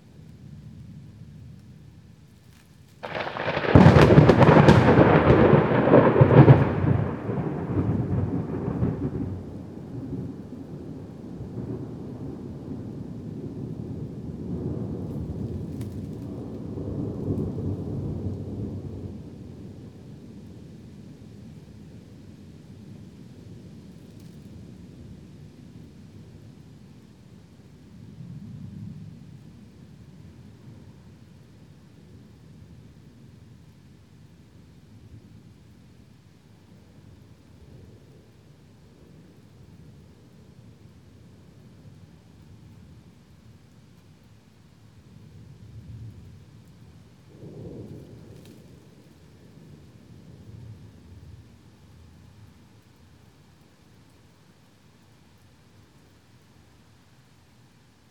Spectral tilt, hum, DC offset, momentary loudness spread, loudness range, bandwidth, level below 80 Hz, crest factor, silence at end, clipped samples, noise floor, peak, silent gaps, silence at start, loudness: -8.5 dB/octave; none; under 0.1%; 31 LU; 29 LU; 9 kHz; -46 dBFS; 26 dB; 6.7 s; under 0.1%; -57 dBFS; 0 dBFS; none; 0.45 s; -22 LUFS